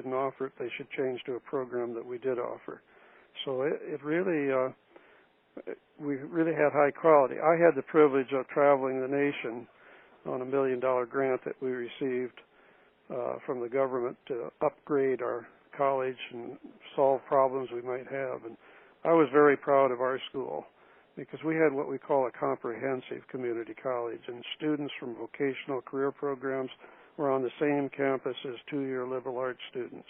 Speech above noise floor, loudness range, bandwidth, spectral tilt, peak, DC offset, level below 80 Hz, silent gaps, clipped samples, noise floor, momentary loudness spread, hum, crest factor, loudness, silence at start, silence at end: 33 dB; 8 LU; 3.8 kHz; -4.5 dB/octave; -10 dBFS; under 0.1%; -82 dBFS; none; under 0.1%; -62 dBFS; 16 LU; none; 22 dB; -30 LUFS; 0 s; 0.1 s